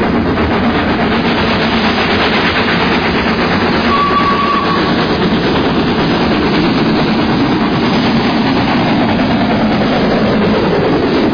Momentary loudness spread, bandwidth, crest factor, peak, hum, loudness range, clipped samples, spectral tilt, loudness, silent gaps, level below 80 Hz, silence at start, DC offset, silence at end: 1 LU; 5.4 kHz; 10 dB; -2 dBFS; none; 1 LU; under 0.1%; -7 dB/octave; -12 LUFS; none; -30 dBFS; 0 s; 0.2%; 0 s